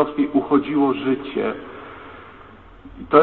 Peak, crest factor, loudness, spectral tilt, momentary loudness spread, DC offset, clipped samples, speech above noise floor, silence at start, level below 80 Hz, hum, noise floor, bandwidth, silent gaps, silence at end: -2 dBFS; 20 dB; -20 LUFS; -10 dB/octave; 22 LU; 0.2%; under 0.1%; 24 dB; 0 s; -52 dBFS; none; -44 dBFS; 4.3 kHz; none; 0 s